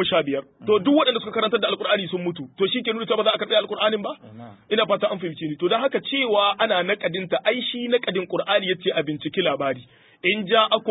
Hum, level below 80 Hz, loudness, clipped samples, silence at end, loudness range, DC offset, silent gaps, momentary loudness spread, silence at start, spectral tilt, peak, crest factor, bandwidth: none; -68 dBFS; -22 LUFS; under 0.1%; 0 s; 2 LU; under 0.1%; none; 9 LU; 0 s; -9.5 dB/octave; -4 dBFS; 18 dB; 4 kHz